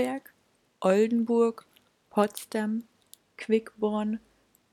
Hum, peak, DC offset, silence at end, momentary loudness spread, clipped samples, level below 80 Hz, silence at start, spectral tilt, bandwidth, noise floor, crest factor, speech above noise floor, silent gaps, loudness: none; -8 dBFS; under 0.1%; 0.55 s; 13 LU; under 0.1%; -74 dBFS; 0 s; -6 dB/octave; 18 kHz; -69 dBFS; 20 dB; 42 dB; none; -28 LUFS